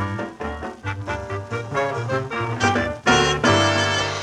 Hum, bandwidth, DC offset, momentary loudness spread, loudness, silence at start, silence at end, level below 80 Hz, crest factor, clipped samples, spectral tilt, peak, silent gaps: none; 12 kHz; under 0.1%; 13 LU; -21 LUFS; 0 s; 0 s; -42 dBFS; 20 dB; under 0.1%; -4 dB/octave; -2 dBFS; none